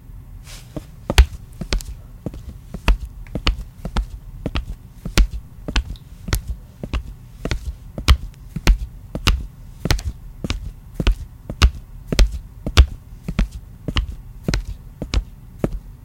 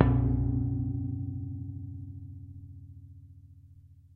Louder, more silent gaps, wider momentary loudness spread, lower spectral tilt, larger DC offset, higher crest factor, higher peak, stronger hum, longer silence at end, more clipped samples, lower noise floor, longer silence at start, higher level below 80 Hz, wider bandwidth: first, -24 LUFS vs -32 LUFS; neither; second, 16 LU vs 23 LU; second, -4.5 dB/octave vs -12 dB/octave; neither; second, 22 dB vs 28 dB; about the same, 0 dBFS vs -2 dBFS; neither; second, 0 s vs 0.15 s; neither; second, -37 dBFS vs -55 dBFS; about the same, 0.05 s vs 0 s; first, -22 dBFS vs -40 dBFS; first, 16.5 kHz vs 3.4 kHz